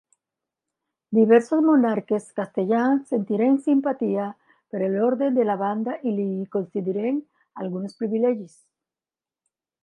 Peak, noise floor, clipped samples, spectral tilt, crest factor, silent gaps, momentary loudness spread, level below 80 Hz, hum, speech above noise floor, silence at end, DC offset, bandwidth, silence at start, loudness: -4 dBFS; under -90 dBFS; under 0.1%; -8 dB/octave; 18 dB; none; 12 LU; -80 dBFS; none; over 68 dB; 1.35 s; under 0.1%; 10.5 kHz; 1.1 s; -23 LUFS